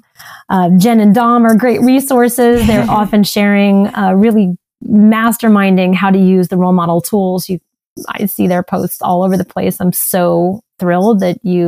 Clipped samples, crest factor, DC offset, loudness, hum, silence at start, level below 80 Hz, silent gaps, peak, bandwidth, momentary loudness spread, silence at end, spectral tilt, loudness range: under 0.1%; 10 dB; under 0.1%; -11 LUFS; none; 0.25 s; -38 dBFS; 7.86-7.96 s; -2 dBFS; 16 kHz; 8 LU; 0 s; -6.5 dB/octave; 5 LU